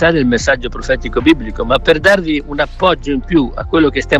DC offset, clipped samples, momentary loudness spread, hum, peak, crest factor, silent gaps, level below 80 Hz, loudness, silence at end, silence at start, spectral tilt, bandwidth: under 0.1%; under 0.1%; 7 LU; none; 0 dBFS; 14 dB; none; -26 dBFS; -14 LUFS; 0 s; 0 s; -5.5 dB/octave; 12 kHz